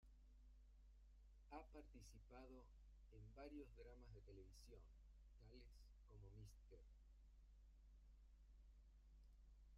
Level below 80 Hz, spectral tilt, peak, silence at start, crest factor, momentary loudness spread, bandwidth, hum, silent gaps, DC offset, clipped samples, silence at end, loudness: -66 dBFS; -6 dB/octave; -46 dBFS; 0 s; 18 dB; 8 LU; 10 kHz; none; none; under 0.1%; under 0.1%; 0 s; -65 LUFS